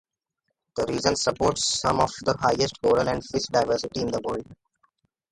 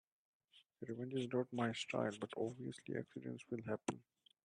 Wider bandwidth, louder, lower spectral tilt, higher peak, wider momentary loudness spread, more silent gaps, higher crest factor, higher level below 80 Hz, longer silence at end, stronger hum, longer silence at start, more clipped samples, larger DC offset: about the same, 11.5 kHz vs 10.5 kHz; first, -24 LUFS vs -44 LUFS; second, -3.5 dB/octave vs -5.5 dB/octave; first, -4 dBFS vs -24 dBFS; second, 7 LU vs 10 LU; neither; about the same, 22 dB vs 22 dB; first, -50 dBFS vs -82 dBFS; first, 0.8 s vs 0.45 s; neither; first, 0.75 s vs 0.55 s; neither; neither